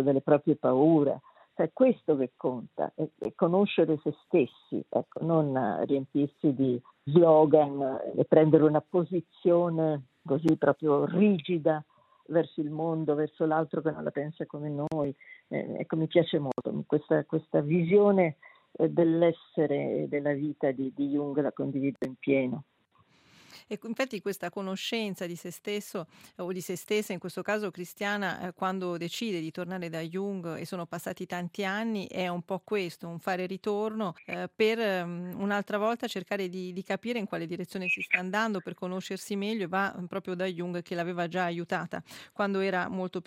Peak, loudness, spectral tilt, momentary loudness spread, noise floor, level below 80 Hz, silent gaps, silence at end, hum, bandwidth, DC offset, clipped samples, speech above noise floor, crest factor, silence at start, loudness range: -6 dBFS; -29 LUFS; -7 dB/octave; 12 LU; -66 dBFS; -76 dBFS; none; 0.05 s; none; 15.5 kHz; under 0.1%; under 0.1%; 38 dB; 22 dB; 0 s; 9 LU